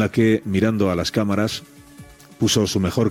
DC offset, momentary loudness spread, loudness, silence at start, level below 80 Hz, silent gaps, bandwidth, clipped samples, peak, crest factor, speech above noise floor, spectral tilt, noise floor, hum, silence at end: under 0.1%; 5 LU; -20 LUFS; 0 s; -50 dBFS; none; 16.5 kHz; under 0.1%; -6 dBFS; 14 dB; 25 dB; -5 dB/octave; -44 dBFS; none; 0 s